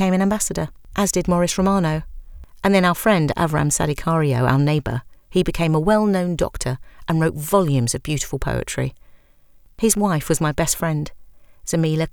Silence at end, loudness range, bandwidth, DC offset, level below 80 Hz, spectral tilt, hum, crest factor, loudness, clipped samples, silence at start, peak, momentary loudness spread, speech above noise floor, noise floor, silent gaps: 0.05 s; 3 LU; 20 kHz; under 0.1%; -38 dBFS; -5 dB/octave; none; 18 dB; -20 LUFS; under 0.1%; 0 s; -2 dBFS; 10 LU; 31 dB; -50 dBFS; none